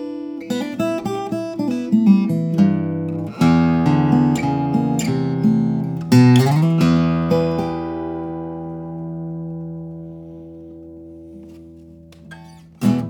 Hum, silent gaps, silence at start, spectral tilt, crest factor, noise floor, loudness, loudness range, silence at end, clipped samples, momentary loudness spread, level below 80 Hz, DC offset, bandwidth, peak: none; none; 0 s; -7.5 dB/octave; 18 dB; -42 dBFS; -18 LUFS; 16 LU; 0 s; under 0.1%; 22 LU; -50 dBFS; under 0.1%; 18.5 kHz; 0 dBFS